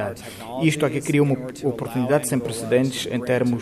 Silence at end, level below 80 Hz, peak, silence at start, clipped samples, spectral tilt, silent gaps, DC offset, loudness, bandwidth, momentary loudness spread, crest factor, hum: 0 s; -56 dBFS; -6 dBFS; 0 s; under 0.1%; -5.5 dB/octave; none; under 0.1%; -22 LUFS; 15 kHz; 7 LU; 18 dB; none